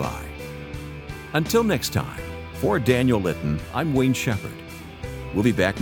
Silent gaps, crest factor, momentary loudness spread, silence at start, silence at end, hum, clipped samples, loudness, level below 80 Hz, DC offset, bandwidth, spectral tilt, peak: none; 18 dB; 15 LU; 0 s; 0 s; none; under 0.1%; -23 LUFS; -42 dBFS; under 0.1%; 18 kHz; -5.5 dB/octave; -4 dBFS